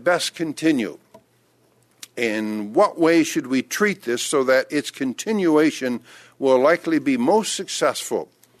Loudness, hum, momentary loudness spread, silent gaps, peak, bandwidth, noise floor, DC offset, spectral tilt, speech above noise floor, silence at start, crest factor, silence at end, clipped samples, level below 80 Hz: -21 LUFS; none; 10 LU; none; -6 dBFS; 14 kHz; -61 dBFS; under 0.1%; -4 dB/octave; 40 dB; 0 s; 16 dB; 0.35 s; under 0.1%; -70 dBFS